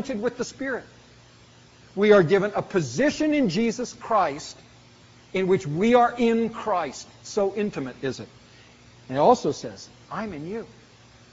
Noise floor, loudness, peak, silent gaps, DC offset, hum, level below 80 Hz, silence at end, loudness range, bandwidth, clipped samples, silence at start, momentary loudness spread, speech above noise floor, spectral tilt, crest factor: -52 dBFS; -24 LUFS; -4 dBFS; none; under 0.1%; none; -58 dBFS; 0.6 s; 5 LU; 8 kHz; under 0.1%; 0 s; 17 LU; 29 dB; -5 dB/octave; 20 dB